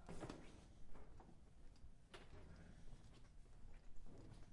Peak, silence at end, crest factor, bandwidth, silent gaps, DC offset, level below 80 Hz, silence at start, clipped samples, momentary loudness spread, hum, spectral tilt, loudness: -38 dBFS; 0 s; 18 dB; 11 kHz; none; under 0.1%; -62 dBFS; 0 s; under 0.1%; 11 LU; none; -5.5 dB/octave; -64 LUFS